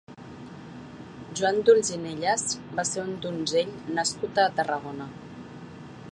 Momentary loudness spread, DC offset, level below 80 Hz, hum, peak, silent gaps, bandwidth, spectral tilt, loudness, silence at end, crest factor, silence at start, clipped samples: 21 LU; under 0.1%; -62 dBFS; none; -6 dBFS; none; 11 kHz; -3 dB/octave; -26 LUFS; 0 s; 22 dB; 0.1 s; under 0.1%